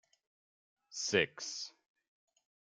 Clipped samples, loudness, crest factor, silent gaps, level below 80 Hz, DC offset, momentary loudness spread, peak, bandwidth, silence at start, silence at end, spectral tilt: under 0.1%; -35 LUFS; 26 dB; none; -80 dBFS; under 0.1%; 15 LU; -14 dBFS; 10 kHz; 0.9 s; 1.1 s; -2 dB/octave